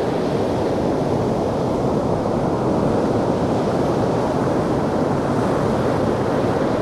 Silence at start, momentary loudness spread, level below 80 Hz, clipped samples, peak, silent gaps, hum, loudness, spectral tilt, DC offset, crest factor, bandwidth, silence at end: 0 s; 1 LU; -40 dBFS; under 0.1%; -6 dBFS; none; none; -20 LUFS; -7.5 dB/octave; under 0.1%; 12 dB; 14 kHz; 0 s